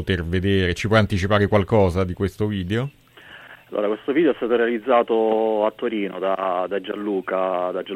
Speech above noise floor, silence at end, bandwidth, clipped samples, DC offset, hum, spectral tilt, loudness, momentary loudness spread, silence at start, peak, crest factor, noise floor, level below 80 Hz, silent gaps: 24 dB; 0 s; 13.5 kHz; under 0.1%; under 0.1%; none; -7 dB/octave; -21 LUFS; 7 LU; 0 s; -4 dBFS; 18 dB; -45 dBFS; -44 dBFS; none